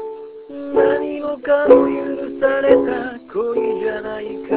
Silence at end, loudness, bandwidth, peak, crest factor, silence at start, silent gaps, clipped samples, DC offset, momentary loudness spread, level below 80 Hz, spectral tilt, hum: 0 s; -18 LUFS; 4 kHz; 0 dBFS; 18 dB; 0 s; none; under 0.1%; under 0.1%; 15 LU; -52 dBFS; -9.5 dB/octave; none